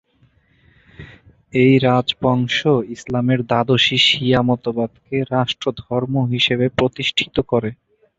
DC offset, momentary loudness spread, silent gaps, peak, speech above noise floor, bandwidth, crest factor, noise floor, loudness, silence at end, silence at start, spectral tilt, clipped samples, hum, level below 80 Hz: under 0.1%; 10 LU; none; -2 dBFS; 40 dB; 8 kHz; 18 dB; -57 dBFS; -17 LUFS; 0.45 s; 1 s; -6 dB/octave; under 0.1%; none; -48 dBFS